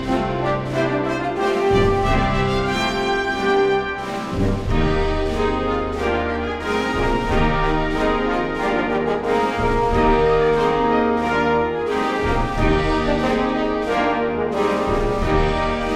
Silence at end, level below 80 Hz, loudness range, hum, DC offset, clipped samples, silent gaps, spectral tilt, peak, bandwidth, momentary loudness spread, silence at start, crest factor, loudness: 0 s; -28 dBFS; 2 LU; none; under 0.1%; under 0.1%; none; -6.5 dB/octave; -4 dBFS; 12.5 kHz; 5 LU; 0 s; 16 dB; -20 LUFS